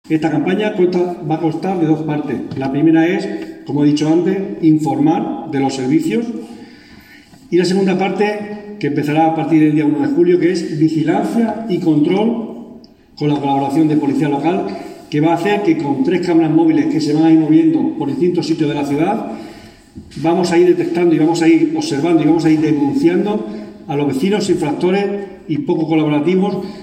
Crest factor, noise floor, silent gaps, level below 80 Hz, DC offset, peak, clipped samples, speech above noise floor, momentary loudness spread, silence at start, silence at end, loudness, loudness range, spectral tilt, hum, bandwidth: 14 dB; -42 dBFS; none; -56 dBFS; under 0.1%; 0 dBFS; under 0.1%; 27 dB; 10 LU; 0.1 s; 0 s; -15 LUFS; 4 LU; -7 dB/octave; none; 9.8 kHz